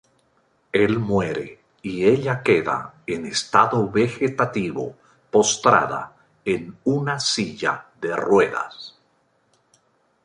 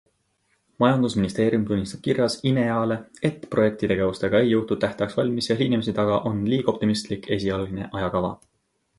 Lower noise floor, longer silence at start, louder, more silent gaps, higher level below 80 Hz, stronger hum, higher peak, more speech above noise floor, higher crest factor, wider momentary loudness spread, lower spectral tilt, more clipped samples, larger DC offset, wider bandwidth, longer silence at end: second, -64 dBFS vs -71 dBFS; about the same, 0.75 s vs 0.8 s; about the same, -21 LUFS vs -23 LUFS; neither; second, -56 dBFS vs -50 dBFS; neither; first, 0 dBFS vs -6 dBFS; second, 44 dB vs 48 dB; about the same, 22 dB vs 18 dB; first, 14 LU vs 6 LU; second, -4.5 dB/octave vs -6.5 dB/octave; neither; neither; about the same, 11 kHz vs 11.5 kHz; first, 1.35 s vs 0.65 s